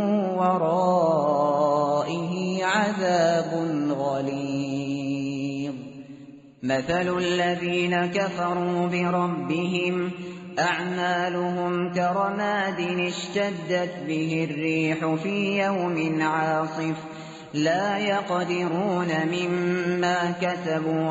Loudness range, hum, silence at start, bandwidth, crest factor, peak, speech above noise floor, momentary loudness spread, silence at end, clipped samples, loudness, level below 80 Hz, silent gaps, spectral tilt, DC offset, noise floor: 4 LU; none; 0 s; 8 kHz; 16 dB; -10 dBFS; 21 dB; 7 LU; 0 s; under 0.1%; -25 LUFS; -64 dBFS; none; -4.5 dB/octave; under 0.1%; -45 dBFS